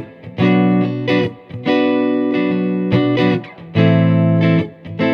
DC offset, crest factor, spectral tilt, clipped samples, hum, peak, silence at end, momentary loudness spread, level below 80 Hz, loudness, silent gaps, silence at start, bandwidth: under 0.1%; 14 dB; -9 dB/octave; under 0.1%; none; 0 dBFS; 0 s; 9 LU; -54 dBFS; -16 LUFS; none; 0 s; 6.2 kHz